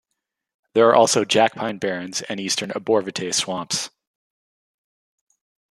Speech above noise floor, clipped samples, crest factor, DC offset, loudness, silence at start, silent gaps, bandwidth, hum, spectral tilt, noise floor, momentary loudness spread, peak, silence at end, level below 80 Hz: 60 dB; under 0.1%; 22 dB; under 0.1%; -20 LUFS; 0.75 s; none; 13 kHz; none; -3 dB/octave; -80 dBFS; 11 LU; -2 dBFS; 1.85 s; -70 dBFS